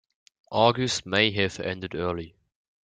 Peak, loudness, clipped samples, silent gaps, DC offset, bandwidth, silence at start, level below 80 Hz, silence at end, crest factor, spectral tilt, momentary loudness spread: -4 dBFS; -25 LUFS; under 0.1%; none; under 0.1%; 9.6 kHz; 0.5 s; -60 dBFS; 0.55 s; 22 dB; -4 dB/octave; 10 LU